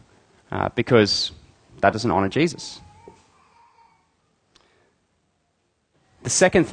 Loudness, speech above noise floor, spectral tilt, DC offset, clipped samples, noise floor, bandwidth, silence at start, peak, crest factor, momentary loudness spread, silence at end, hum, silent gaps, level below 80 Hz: -21 LUFS; 50 dB; -4 dB/octave; under 0.1%; under 0.1%; -70 dBFS; 10 kHz; 0.5 s; -2 dBFS; 24 dB; 18 LU; 0 s; none; none; -52 dBFS